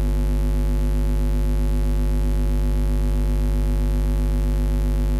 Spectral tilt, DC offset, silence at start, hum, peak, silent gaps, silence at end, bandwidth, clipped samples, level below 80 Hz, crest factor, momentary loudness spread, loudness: -7.5 dB/octave; under 0.1%; 0 s; 50 Hz at -20 dBFS; -12 dBFS; none; 0 s; 13 kHz; under 0.1%; -20 dBFS; 8 dB; 0 LU; -23 LUFS